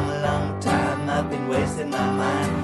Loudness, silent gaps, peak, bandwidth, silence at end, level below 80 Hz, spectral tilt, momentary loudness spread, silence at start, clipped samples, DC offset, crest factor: -24 LUFS; none; -8 dBFS; 12 kHz; 0 s; -42 dBFS; -6 dB/octave; 2 LU; 0 s; under 0.1%; under 0.1%; 14 dB